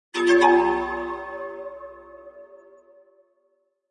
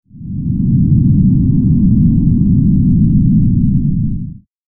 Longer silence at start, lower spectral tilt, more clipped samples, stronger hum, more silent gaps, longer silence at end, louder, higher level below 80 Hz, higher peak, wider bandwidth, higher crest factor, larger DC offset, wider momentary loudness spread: about the same, 0.15 s vs 0.15 s; second, -4 dB/octave vs -16.5 dB/octave; neither; neither; neither; first, 1.35 s vs 0.35 s; second, -21 LUFS vs -12 LUFS; second, -56 dBFS vs -22 dBFS; second, -6 dBFS vs 0 dBFS; first, 10 kHz vs 1.1 kHz; first, 20 dB vs 10 dB; neither; first, 27 LU vs 9 LU